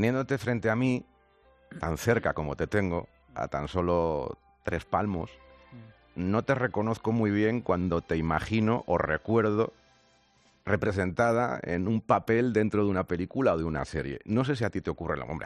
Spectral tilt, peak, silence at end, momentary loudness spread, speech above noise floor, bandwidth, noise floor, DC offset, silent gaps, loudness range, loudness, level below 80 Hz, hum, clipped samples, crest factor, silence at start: -7.5 dB/octave; -10 dBFS; 0 s; 9 LU; 36 dB; 11.5 kHz; -64 dBFS; under 0.1%; none; 4 LU; -29 LUFS; -52 dBFS; none; under 0.1%; 20 dB; 0 s